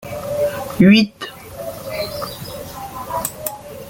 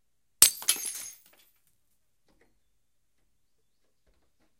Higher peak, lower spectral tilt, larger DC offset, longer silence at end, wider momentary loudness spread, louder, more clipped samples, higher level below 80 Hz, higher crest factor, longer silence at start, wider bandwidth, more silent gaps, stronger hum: about the same, -2 dBFS vs 0 dBFS; first, -5.5 dB/octave vs 2 dB/octave; neither; second, 0 s vs 3.5 s; about the same, 19 LU vs 20 LU; first, -18 LUFS vs -23 LUFS; neither; first, -48 dBFS vs -68 dBFS; second, 18 dB vs 34 dB; second, 0 s vs 0.4 s; about the same, 17 kHz vs 17 kHz; neither; neither